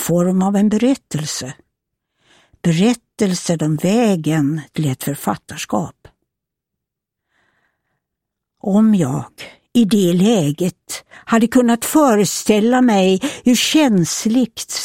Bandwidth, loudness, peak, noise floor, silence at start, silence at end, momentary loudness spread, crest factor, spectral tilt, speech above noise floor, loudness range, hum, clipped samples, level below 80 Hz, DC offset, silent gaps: 16.5 kHz; -16 LUFS; -2 dBFS; -81 dBFS; 0 s; 0 s; 10 LU; 16 dB; -5 dB/octave; 66 dB; 11 LU; none; under 0.1%; -54 dBFS; under 0.1%; none